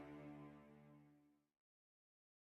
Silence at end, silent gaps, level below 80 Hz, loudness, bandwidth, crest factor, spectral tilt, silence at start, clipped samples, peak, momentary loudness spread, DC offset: 1.15 s; none; -86 dBFS; -61 LUFS; 8.2 kHz; 16 dB; -8 dB/octave; 0 s; under 0.1%; -46 dBFS; 11 LU; under 0.1%